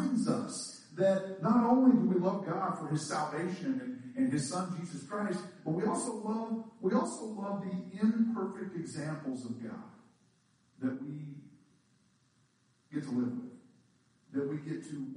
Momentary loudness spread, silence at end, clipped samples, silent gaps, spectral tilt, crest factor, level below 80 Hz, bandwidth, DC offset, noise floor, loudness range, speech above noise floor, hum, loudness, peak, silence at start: 13 LU; 0 s; under 0.1%; none; -6.5 dB/octave; 20 dB; -80 dBFS; 10.5 kHz; under 0.1%; -71 dBFS; 13 LU; 38 dB; none; -34 LUFS; -14 dBFS; 0 s